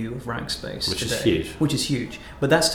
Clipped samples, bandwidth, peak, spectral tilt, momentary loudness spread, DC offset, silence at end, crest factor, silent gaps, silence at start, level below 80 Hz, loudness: under 0.1%; 20 kHz; -6 dBFS; -4 dB/octave; 8 LU; under 0.1%; 0 s; 18 dB; none; 0 s; -44 dBFS; -24 LUFS